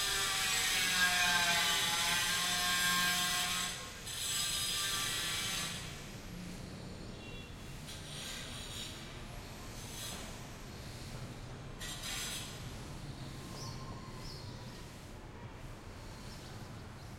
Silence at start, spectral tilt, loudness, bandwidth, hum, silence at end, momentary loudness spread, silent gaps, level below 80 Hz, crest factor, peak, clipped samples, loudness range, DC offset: 0 s; -1 dB/octave; -33 LUFS; 16.5 kHz; none; 0 s; 19 LU; none; -54 dBFS; 22 dB; -16 dBFS; under 0.1%; 17 LU; under 0.1%